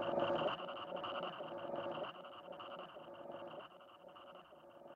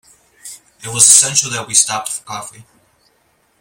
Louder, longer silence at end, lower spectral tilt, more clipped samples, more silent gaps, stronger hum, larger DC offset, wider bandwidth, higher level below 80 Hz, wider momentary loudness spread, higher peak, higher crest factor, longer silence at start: second, -44 LUFS vs -11 LUFS; second, 0 s vs 1 s; first, -6.5 dB/octave vs 0 dB/octave; second, under 0.1% vs 0.2%; neither; neither; neither; second, 7.4 kHz vs over 20 kHz; second, -80 dBFS vs -60 dBFS; second, 20 LU vs 27 LU; second, -24 dBFS vs 0 dBFS; about the same, 20 dB vs 18 dB; second, 0 s vs 0.45 s